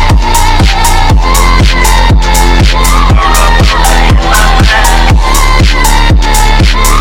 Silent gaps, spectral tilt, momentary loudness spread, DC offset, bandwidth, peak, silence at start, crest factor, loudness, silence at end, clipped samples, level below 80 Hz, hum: none; -4 dB/octave; 1 LU; 1%; 17 kHz; 0 dBFS; 0 s; 4 dB; -7 LUFS; 0 s; 2%; -6 dBFS; none